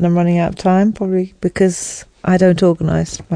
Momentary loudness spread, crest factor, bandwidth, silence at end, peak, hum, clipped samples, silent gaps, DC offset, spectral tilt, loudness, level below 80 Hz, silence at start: 9 LU; 14 dB; 10 kHz; 0 s; 0 dBFS; none; under 0.1%; none; 0.2%; -6.5 dB/octave; -15 LUFS; -40 dBFS; 0 s